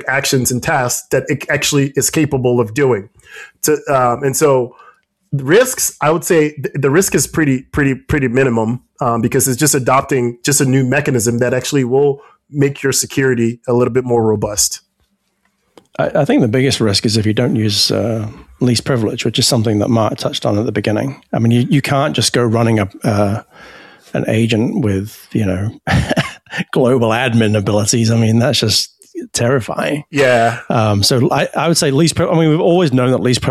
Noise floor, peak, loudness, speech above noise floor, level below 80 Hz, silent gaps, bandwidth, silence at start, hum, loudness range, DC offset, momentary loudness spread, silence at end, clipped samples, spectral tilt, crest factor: -63 dBFS; 0 dBFS; -14 LUFS; 49 dB; -42 dBFS; none; 15 kHz; 0 s; none; 2 LU; under 0.1%; 7 LU; 0 s; under 0.1%; -4.5 dB/octave; 14 dB